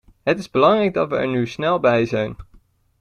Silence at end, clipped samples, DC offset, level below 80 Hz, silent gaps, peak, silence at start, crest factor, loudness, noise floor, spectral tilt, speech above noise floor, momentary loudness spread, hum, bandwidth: 0.6 s; under 0.1%; under 0.1%; -50 dBFS; none; -2 dBFS; 0.25 s; 18 dB; -19 LUFS; -53 dBFS; -6.5 dB/octave; 35 dB; 7 LU; none; 10.5 kHz